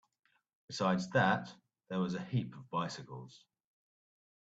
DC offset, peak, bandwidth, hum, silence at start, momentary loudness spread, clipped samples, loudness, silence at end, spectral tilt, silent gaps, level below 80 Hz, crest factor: under 0.1%; -16 dBFS; 8 kHz; none; 0.7 s; 19 LU; under 0.1%; -35 LUFS; 1.15 s; -6 dB/octave; none; -74 dBFS; 22 dB